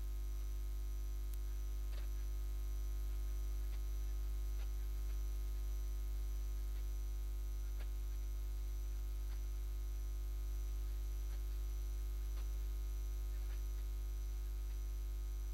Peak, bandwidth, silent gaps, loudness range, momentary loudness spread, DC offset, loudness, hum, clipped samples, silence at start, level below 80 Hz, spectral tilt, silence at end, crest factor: -32 dBFS; 16 kHz; none; 1 LU; 1 LU; under 0.1%; -45 LUFS; 50 Hz at -40 dBFS; under 0.1%; 0 s; -40 dBFS; -5.5 dB/octave; 0 s; 10 dB